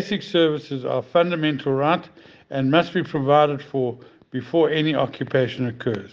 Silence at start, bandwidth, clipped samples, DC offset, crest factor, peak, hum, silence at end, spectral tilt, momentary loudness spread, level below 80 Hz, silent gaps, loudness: 0 s; 7.4 kHz; under 0.1%; under 0.1%; 18 dB; -2 dBFS; none; 0.05 s; -7.5 dB/octave; 9 LU; -64 dBFS; none; -22 LUFS